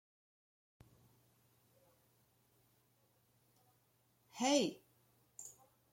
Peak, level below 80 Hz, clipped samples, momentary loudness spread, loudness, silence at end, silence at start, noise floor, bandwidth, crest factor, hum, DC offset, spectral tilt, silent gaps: -20 dBFS; -86 dBFS; under 0.1%; 24 LU; -36 LUFS; 0.4 s; 4.35 s; -76 dBFS; 16.5 kHz; 26 dB; none; under 0.1%; -3 dB/octave; none